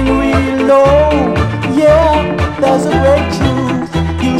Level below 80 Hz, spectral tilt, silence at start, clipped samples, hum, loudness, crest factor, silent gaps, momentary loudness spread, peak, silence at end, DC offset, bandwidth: -24 dBFS; -7 dB/octave; 0 s; under 0.1%; none; -11 LUFS; 10 dB; none; 7 LU; 0 dBFS; 0 s; under 0.1%; 13 kHz